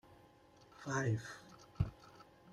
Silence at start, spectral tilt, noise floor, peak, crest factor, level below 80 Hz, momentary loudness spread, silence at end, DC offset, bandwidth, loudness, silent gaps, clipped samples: 0.1 s; -6 dB/octave; -64 dBFS; -22 dBFS; 22 dB; -58 dBFS; 23 LU; 0 s; under 0.1%; 12 kHz; -41 LUFS; none; under 0.1%